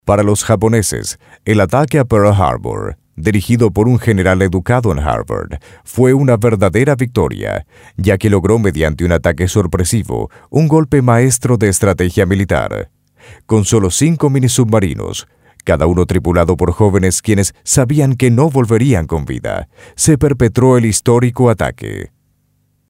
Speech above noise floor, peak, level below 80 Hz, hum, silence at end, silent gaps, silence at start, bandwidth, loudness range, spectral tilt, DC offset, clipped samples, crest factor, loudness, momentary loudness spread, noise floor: 47 dB; 0 dBFS; -32 dBFS; none; 0.8 s; none; 0.05 s; 16.5 kHz; 2 LU; -6 dB/octave; under 0.1%; under 0.1%; 12 dB; -13 LUFS; 11 LU; -59 dBFS